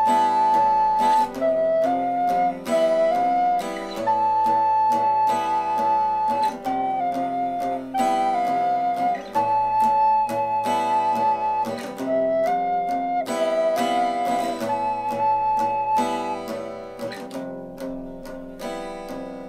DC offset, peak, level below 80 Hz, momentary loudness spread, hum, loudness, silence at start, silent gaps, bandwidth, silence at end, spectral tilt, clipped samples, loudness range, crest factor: under 0.1%; -10 dBFS; -54 dBFS; 13 LU; none; -22 LUFS; 0 s; none; 15.5 kHz; 0 s; -4.5 dB/octave; under 0.1%; 4 LU; 12 dB